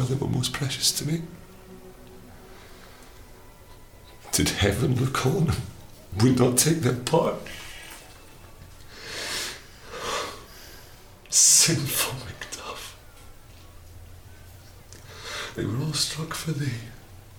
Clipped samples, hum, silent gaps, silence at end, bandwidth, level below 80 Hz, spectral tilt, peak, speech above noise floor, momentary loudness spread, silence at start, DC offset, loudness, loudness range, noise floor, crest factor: under 0.1%; none; none; 0.05 s; 19.5 kHz; -48 dBFS; -3.5 dB/octave; -4 dBFS; 24 dB; 22 LU; 0 s; under 0.1%; -24 LUFS; 12 LU; -47 dBFS; 24 dB